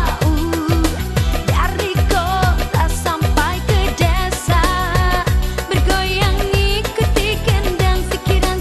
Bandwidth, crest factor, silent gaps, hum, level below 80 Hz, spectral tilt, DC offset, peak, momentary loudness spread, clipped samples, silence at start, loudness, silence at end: 14 kHz; 16 dB; none; none; -20 dBFS; -5 dB/octave; under 0.1%; 0 dBFS; 3 LU; under 0.1%; 0 s; -17 LUFS; 0 s